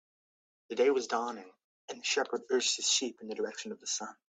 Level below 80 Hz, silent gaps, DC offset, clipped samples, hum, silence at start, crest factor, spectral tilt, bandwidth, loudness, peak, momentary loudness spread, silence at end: -84 dBFS; 1.64-1.88 s; under 0.1%; under 0.1%; none; 0.7 s; 18 dB; -0.5 dB/octave; 9.4 kHz; -32 LUFS; -16 dBFS; 12 LU; 0.2 s